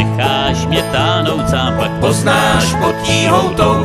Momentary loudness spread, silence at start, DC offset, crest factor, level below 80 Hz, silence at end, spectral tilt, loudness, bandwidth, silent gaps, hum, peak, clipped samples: 4 LU; 0 s; under 0.1%; 14 dB; -30 dBFS; 0 s; -5 dB/octave; -13 LUFS; 14 kHz; none; none; 0 dBFS; under 0.1%